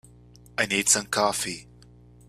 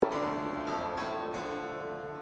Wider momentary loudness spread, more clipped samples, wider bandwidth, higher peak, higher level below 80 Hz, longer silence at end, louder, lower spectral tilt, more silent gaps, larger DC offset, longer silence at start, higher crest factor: first, 14 LU vs 5 LU; neither; first, 15.5 kHz vs 9.2 kHz; first, -4 dBFS vs -10 dBFS; about the same, -56 dBFS vs -60 dBFS; first, 0.65 s vs 0 s; first, -23 LUFS vs -35 LUFS; second, -1.5 dB/octave vs -5.5 dB/octave; neither; neither; first, 0.6 s vs 0 s; about the same, 24 dB vs 24 dB